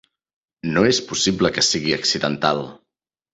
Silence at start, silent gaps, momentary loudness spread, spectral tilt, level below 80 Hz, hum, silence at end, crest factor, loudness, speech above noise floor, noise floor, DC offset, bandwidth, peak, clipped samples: 0.65 s; none; 8 LU; -3 dB/octave; -52 dBFS; none; 0.6 s; 18 dB; -19 LUFS; 62 dB; -81 dBFS; under 0.1%; 8.4 kHz; -2 dBFS; under 0.1%